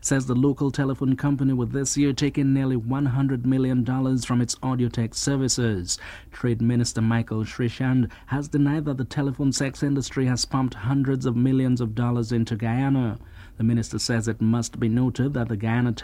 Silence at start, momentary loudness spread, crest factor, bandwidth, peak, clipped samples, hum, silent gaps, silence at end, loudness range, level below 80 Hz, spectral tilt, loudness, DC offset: 0 s; 4 LU; 14 dB; 13 kHz; -8 dBFS; under 0.1%; none; none; 0 s; 2 LU; -46 dBFS; -5.5 dB/octave; -24 LUFS; under 0.1%